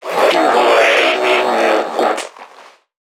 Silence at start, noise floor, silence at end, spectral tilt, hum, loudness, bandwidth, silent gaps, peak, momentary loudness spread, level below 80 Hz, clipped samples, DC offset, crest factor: 0 s; -43 dBFS; 0.45 s; -2 dB/octave; none; -13 LUFS; 17.5 kHz; none; 0 dBFS; 8 LU; -70 dBFS; under 0.1%; under 0.1%; 14 dB